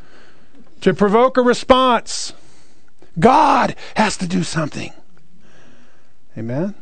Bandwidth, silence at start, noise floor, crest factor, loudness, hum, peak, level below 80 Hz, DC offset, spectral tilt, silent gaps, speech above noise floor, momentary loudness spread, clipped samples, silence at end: 9.4 kHz; 0.8 s; -56 dBFS; 18 dB; -16 LUFS; none; 0 dBFS; -46 dBFS; 3%; -5 dB/octave; none; 40 dB; 16 LU; under 0.1%; 0.1 s